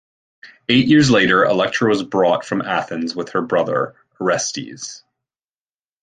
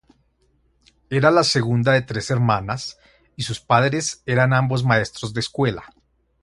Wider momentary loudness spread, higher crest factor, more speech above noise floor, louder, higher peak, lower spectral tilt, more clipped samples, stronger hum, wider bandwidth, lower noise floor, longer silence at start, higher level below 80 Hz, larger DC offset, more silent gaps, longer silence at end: first, 15 LU vs 11 LU; about the same, 16 dB vs 20 dB; first, over 73 dB vs 43 dB; first, -17 LUFS vs -20 LUFS; about the same, -2 dBFS vs 0 dBFS; about the same, -4.5 dB/octave vs -5 dB/octave; neither; neither; second, 9.6 kHz vs 11.5 kHz; first, under -90 dBFS vs -63 dBFS; second, 0.45 s vs 1.1 s; about the same, -54 dBFS vs -50 dBFS; neither; neither; first, 1.05 s vs 0.55 s